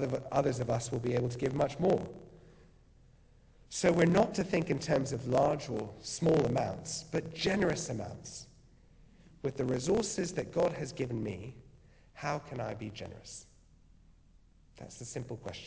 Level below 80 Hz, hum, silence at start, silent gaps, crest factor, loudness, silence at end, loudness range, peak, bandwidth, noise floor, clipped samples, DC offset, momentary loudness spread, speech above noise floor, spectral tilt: -58 dBFS; none; 0 s; none; 22 dB; -33 LUFS; 0 s; 12 LU; -12 dBFS; 8 kHz; -62 dBFS; under 0.1%; under 0.1%; 16 LU; 29 dB; -5.5 dB/octave